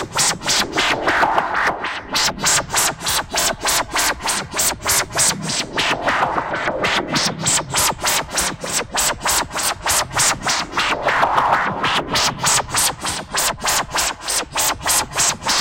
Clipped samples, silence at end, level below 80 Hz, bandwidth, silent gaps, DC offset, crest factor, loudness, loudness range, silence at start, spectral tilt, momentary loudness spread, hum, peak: under 0.1%; 0 s; -42 dBFS; 17 kHz; none; under 0.1%; 16 dB; -17 LUFS; 1 LU; 0 s; -1 dB/octave; 5 LU; none; -4 dBFS